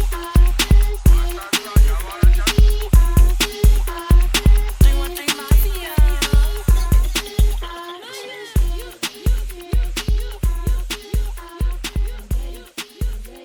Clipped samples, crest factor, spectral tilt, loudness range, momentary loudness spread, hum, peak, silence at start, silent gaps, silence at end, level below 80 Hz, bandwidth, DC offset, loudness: under 0.1%; 14 dB; -4.5 dB/octave; 8 LU; 12 LU; none; -2 dBFS; 0 s; none; 0.05 s; -16 dBFS; 19 kHz; under 0.1%; -19 LUFS